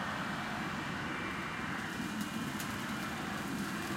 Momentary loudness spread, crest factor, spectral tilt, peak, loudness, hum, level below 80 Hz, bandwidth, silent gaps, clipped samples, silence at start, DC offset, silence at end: 1 LU; 16 dB; -4 dB/octave; -22 dBFS; -38 LUFS; none; -60 dBFS; 16 kHz; none; under 0.1%; 0 s; under 0.1%; 0 s